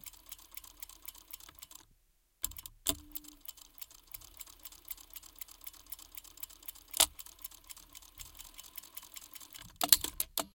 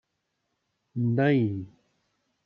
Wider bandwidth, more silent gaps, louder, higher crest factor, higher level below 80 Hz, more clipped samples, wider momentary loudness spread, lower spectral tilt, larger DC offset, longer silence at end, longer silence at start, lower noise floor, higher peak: first, 17 kHz vs 5.4 kHz; neither; second, -35 LUFS vs -26 LUFS; first, 40 dB vs 18 dB; first, -62 dBFS vs -72 dBFS; neither; first, 21 LU vs 16 LU; second, 0 dB/octave vs -10 dB/octave; neither; second, 0.05 s vs 0.8 s; second, 0.05 s vs 0.95 s; second, -71 dBFS vs -79 dBFS; first, -2 dBFS vs -10 dBFS